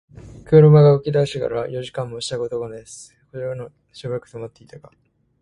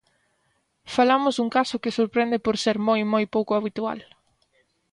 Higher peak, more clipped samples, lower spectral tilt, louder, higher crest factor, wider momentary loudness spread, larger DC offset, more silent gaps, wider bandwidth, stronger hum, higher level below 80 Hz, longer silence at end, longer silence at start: first, 0 dBFS vs -8 dBFS; neither; first, -7.5 dB/octave vs -5 dB/octave; first, -18 LUFS vs -23 LUFS; about the same, 18 dB vs 16 dB; first, 25 LU vs 9 LU; neither; neither; about the same, 11 kHz vs 11.5 kHz; neither; first, -52 dBFS vs -62 dBFS; second, 0.65 s vs 0.9 s; second, 0.25 s vs 0.85 s